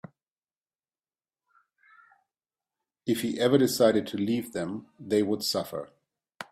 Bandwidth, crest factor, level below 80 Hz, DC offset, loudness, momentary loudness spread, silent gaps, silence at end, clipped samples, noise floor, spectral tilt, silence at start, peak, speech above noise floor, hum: 16 kHz; 22 dB; -70 dBFS; under 0.1%; -27 LUFS; 16 LU; none; 0.1 s; under 0.1%; under -90 dBFS; -5 dB/octave; 3.05 s; -8 dBFS; over 64 dB; none